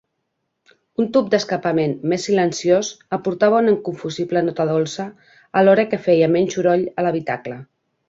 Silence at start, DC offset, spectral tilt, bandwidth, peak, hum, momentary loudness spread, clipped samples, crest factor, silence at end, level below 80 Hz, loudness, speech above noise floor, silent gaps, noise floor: 1 s; under 0.1%; -5.5 dB/octave; 7.8 kHz; -2 dBFS; none; 11 LU; under 0.1%; 16 dB; 0.45 s; -62 dBFS; -19 LUFS; 56 dB; none; -74 dBFS